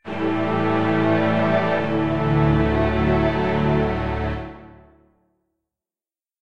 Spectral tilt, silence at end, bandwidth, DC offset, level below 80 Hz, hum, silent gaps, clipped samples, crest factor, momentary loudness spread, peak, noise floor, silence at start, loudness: -8.5 dB/octave; 0 s; 7.2 kHz; 1%; -34 dBFS; none; none; under 0.1%; 16 dB; 6 LU; -6 dBFS; under -90 dBFS; 0 s; -20 LUFS